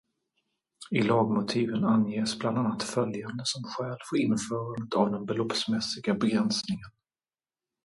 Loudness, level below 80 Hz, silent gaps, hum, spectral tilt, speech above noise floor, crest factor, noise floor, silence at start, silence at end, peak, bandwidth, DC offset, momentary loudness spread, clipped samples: -29 LUFS; -66 dBFS; none; none; -5 dB/octave; over 62 dB; 20 dB; under -90 dBFS; 0.8 s; 0.95 s; -10 dBFS; 11.5 kHz; under 0.1%; 8 LU; under 0.1%